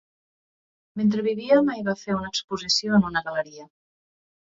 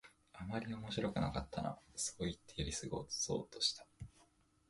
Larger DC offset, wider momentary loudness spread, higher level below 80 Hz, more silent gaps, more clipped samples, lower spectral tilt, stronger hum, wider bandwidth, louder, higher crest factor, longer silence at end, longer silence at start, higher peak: neither; second, 10 LU vs 14 LU; about the same, -60 dBFS vs -58 dBFS; first, 2.44-2.48 s vs none; neither; about the same, -4.5 dB/octave vs -3.5 dB/octave; neither; second, 7.8 kHz vs 11.5 kHz; first, -23 LUFS vs -41 LUFS; about the same, 18 dB vs 20 dB; first, 0.75 s vs 0.45 s; first, 0.95 s vs 0.05 s; first, -6 dBFS vs -22 dBFS